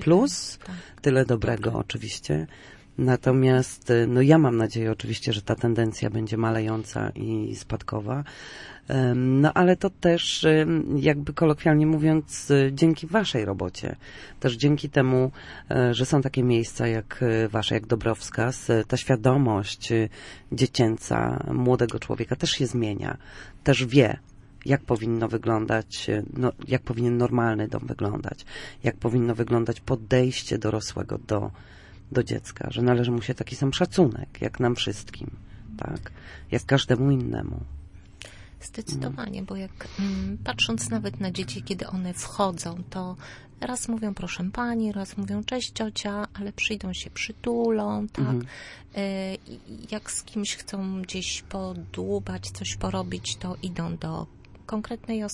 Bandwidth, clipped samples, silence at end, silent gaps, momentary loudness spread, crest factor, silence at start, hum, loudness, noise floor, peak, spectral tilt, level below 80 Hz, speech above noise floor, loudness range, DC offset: 11.5 kHz; under 0.1%; 0 s; none; 15 LU; 22 dB; 0 s; none; -25 LUFS; -45 dBFS; -4 dBFS; -6 dB/octave; -48 dBFS; 20 dB; 9 LU; under 0.1%